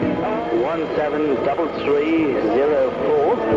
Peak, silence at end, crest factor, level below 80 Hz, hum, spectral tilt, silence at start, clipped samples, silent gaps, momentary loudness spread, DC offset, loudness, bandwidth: -8 dBFS; 0 s; 12 dB; -48 dBFS; none; -7.5 dB/octave; 0 s; under 0.1%; none; 4 LU; under 0.1%; -19 LUFS; 7.4 kHz